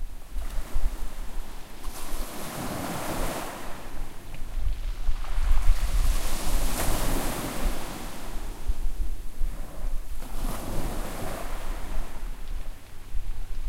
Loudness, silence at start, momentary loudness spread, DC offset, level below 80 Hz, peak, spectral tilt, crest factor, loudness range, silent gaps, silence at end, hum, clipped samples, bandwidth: -34 LUFS; 0 s; 12 LU; under 0.1%; -28 dBFS; -6 dBFS; -4 dB/octave; 18 dB; 6 LU; none; 0 s; none; under 0.1%; 16 kHz